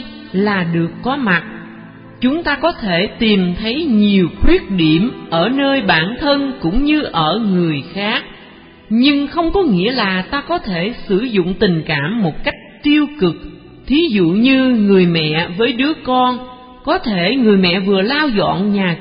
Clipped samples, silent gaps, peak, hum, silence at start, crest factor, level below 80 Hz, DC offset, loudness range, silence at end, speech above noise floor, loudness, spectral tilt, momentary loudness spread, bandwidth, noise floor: under 0.1%; none; 0 dBFS; none; 0 s; 14 dB; -32 dBFS; under 0.1%; 3 LU; 0 s; 25 dB; -15 LUFS; -11.5 dB/octave; 7 LU; 5.2 kHz; -40 dBFS